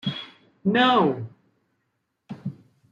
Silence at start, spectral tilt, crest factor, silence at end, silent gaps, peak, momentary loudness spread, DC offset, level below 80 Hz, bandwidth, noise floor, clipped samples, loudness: 0.05 s; -7 dB/octave; 20 dB; 0.35 s; none; -6 dBFS; 23 LU; under 0.1%; -70 dBFS; 7.4 kHz; -76 dBFS; under 0.1%; -22 LUFS